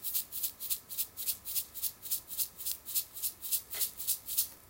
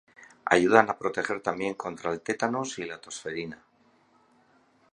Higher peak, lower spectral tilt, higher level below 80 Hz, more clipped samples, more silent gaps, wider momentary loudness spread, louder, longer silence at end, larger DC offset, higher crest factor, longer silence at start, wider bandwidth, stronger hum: second, -12 dBFS vs -2 dBFS; second, 1.5 dB/octave vs -4.5 dB/octave; about the same, -68 dBFS vs -66 dBFS; neither; neither; second, 5 LU vs 16 LU; second, -34 LUFS vs -27 LUFS; second, 0 s vs 1.4 s; neither; about the same, 24 dB vs 28 dB; second, 0 s vs 0.2 s; first, 16.5 kHz vs 11 kHz; neither